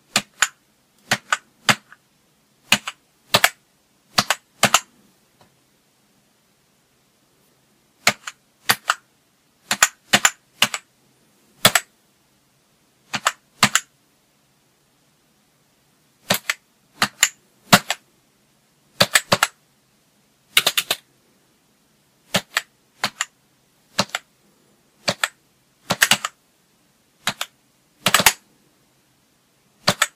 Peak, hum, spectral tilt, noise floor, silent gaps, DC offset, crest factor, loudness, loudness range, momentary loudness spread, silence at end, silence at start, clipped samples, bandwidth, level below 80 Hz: 0 dBFS; none; -1 dB/octave; -62 dBFS; none; under 0.1%; 24 dB; -20 LUFS; 7 LU; 12 LU; 0.1 s; 0.15 s; under 0.1%; 16 kHz; -62 dBFS